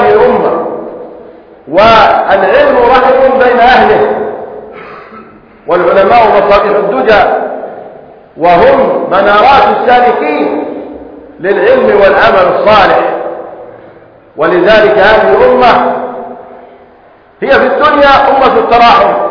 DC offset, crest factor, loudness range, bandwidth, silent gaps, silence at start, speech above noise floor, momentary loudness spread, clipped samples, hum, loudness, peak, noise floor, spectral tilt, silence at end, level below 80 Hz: under 0.1%; 8 dB; 2 LU; 5.4 kHz; none; 0 s; 34 dB; 18 LU; 4%; none; -6 LUFS; 0 dBFS; -39 dBFS; -6 dB/octave; 0 s; -36 dBFS